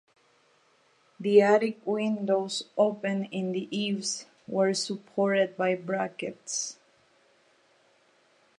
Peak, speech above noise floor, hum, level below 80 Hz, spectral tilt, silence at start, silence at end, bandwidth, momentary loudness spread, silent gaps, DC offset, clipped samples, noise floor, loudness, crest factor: -8 dBFS; 38 dB; none; -82 dBFS; -4 dB/octave; 1.2 s; 1.85 s; 11 kHz; 10 LU; none; under 0.1%; under 0.1%; -65 dBFS; -28 LUFS; 22 dB